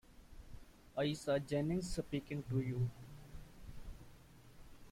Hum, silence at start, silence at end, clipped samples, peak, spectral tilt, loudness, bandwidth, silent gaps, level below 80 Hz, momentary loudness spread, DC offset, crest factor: none; 0.1 s; 0 s; under 0.1%; -24 dBFS; -6.5 dB/octave; -40 LUFS; 16 kHz; none; -56 dBFS; 24 LU; under 0.1%; 18 dB